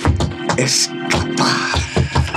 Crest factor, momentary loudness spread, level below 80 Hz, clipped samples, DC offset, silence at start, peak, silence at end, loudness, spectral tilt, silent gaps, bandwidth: 14 dB; 4 LU; -30 dBFS; under 0.1%; under 0.1%; 0 s; -2 dBFS; 0 s; -17 LUFS; -3.5 dB/octave; none; 14.5 kHz